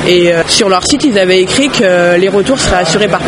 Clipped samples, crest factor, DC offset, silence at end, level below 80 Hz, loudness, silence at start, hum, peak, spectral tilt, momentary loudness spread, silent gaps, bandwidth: 0.2%; 8 dB; under 0.1%; 0 s; -32 dBFS; -9 LUFS; 0 s; none; 0 dBFS; -3.5 dB/octave; 2 LU; none; 12 kHz